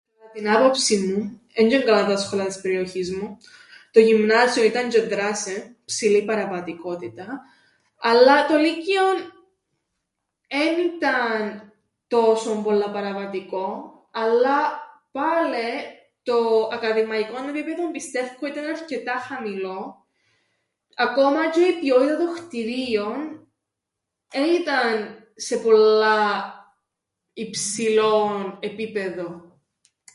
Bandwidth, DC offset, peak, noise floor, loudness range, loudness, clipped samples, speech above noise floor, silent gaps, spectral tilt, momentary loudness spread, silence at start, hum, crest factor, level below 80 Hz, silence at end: 11.5 kHz; under 0.1%; -2 dBFS; -83 dBFS; 5 LU; -21 LUFS; under 0.1%; 62 dB; none; -3.5 dB/octave; 16 LU; 0.25 s; none; 20 dB; -68 dBFS; 0.75 s